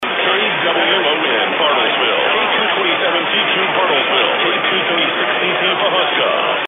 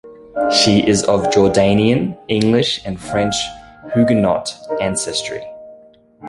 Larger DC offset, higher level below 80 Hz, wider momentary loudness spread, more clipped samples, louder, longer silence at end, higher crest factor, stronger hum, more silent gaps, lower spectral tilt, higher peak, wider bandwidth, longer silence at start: neither; second, -60 dBFS vs -44 dBFS; second, 2 LU vs 13 LU; neither; about the same, -14 LUFS vs -16 LUFS; about the same, 0 s vs 0 s; about the same, 14 dB vs 16 dB; neither; neither; about the same, -5.5 dB/octave vs -4.5 dB/octave; about the same, 0 dBFS vs 0 dBFS; second, 5.6 kHz vs 11.5 kHz; about the same, 0 s vs 0.05 s